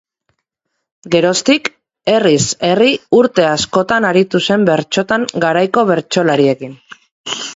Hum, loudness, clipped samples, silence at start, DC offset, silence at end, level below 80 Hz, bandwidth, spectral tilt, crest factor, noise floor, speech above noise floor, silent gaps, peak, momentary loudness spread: none; -13 LUFS; under 0.1%; 1.05 s; under 0.1%; 0 s; -52 dBFS; 8 kHz; -4 dB/octave; 14 dB; -74 dBFS; 61 dB; 7.11-7.24 s; 0 dBFS; 10 LU